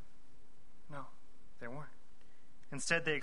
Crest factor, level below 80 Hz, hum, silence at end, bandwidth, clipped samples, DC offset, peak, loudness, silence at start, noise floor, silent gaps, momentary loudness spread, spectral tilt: 26 dB; -68 dBFS; none; 0 s; 10.5 kHz; under 0.1%; 1%; -18 dBFS; -41 LUFS; 0 s; -66 dBFS; none; 21 LU; -3 dB/octave